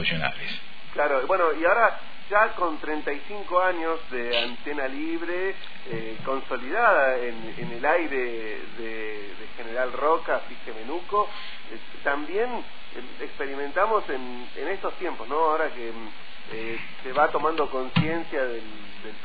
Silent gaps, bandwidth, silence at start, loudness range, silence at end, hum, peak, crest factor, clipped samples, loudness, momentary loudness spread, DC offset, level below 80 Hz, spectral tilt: none; 5 kHz; 0 s; 5 LU; 0 s; none; -6 dBFS; 22 dB; under 0.1%; -26 LUFS; 16 LU; 4%; -56 dBFS; -7.5 dB/octave